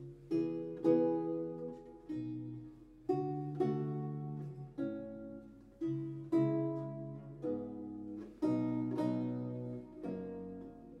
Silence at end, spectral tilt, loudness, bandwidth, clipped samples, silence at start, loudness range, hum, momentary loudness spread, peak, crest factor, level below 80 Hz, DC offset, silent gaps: 0 s; -10 dB/octave; -39 LUFS; 6 kHz; under 0.1%; 0 s; 3 LU; none; 14 LU; -18 dBFS; 20 dB; -68 dBFS; under 0.1%; none